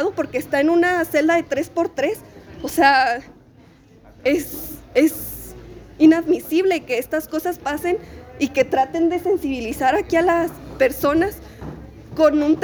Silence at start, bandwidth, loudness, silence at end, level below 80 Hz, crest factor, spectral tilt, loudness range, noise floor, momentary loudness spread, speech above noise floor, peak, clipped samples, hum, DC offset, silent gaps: 0 s; over 20 kHz; -19 LUFS; 0 s; -46 dBFS; 18 dB; -5 dB/octave; 2 LU; -49 dBFS; 16 LU; 30 dB; -2 dBFS; under 0.1%; none; under 0.1%; none